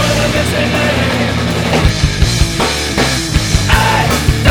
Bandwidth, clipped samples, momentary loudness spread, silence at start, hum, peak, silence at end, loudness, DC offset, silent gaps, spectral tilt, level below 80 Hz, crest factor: over 20 kHz; 0.2%; 3 LU; 0 s; none; 0 dBFS; 0 s; -12 LUFS; under 0.1%; none; -4.5 dB/octave; -20 dBFS; 12 dB